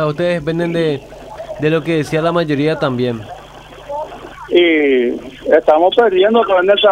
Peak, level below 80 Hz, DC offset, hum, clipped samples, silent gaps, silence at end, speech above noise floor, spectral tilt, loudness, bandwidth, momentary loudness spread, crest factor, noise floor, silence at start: 0 dBFS; -46 dBFS; under 0.1%; none; under 0.1%; none; 0 s; 22 dB; -6.5 dB/octave; -14 LUFS; 12.5 kHz; 18 LU; 14 dB; -36 dBFS; 0 s